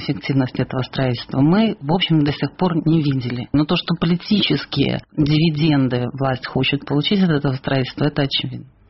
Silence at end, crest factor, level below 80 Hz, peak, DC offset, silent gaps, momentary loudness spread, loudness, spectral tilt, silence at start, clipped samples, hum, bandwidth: 0.25 s; 14 dB; -46 dBFS; -4 dBFS; 0.2%; none; 5 LU; -19 LUFS; -5 dB/octave; 0 s; under 0.1%; none; 5.8 kHz